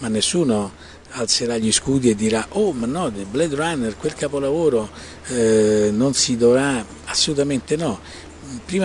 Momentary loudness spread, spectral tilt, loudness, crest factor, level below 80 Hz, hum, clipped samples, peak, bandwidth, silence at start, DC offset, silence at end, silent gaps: 14 LU; -4 dB/octave; -19 LUFS; 16 dB; -48 dBFS; none; under 0.1%; -4 dBFS; 11 kHz; 0 s; under 0.1%; 0 s; none